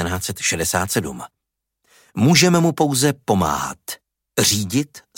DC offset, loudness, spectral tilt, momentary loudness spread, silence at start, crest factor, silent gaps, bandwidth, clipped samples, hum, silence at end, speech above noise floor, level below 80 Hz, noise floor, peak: under 0.1%; -18 LUFS; -4 dB/octave; 19 LU; 0 s; 18 dB; none; 17 kHz; under 0.1%; none; 0.2 s; 58 dB; -48 dBFS; -76 dBFS; -2 dBFS